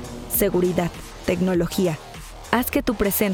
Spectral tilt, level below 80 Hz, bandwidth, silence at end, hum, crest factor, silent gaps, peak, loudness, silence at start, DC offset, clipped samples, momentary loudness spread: -5 dB/octave; -40 dBFS; over 20 kHz; 0 s; none; 20 dB; none; -4 dBFS; -22 LUFS; 0 s; under 0.1%; under 0.1%; 10 LU